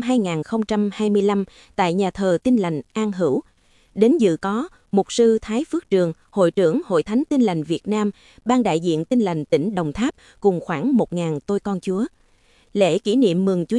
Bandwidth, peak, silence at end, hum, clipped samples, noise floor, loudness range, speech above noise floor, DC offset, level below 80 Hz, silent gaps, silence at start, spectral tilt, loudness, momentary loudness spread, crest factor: 11.5 kHz; -2 dBFS; 0 s; none; under 0.1%; -56 dBFS; 2 LU; 37 dB; under 0.1%; -54 dBFS; none; 0 s; -6.5 dB/octave; -21 LUFS; 7 LU; 18 dB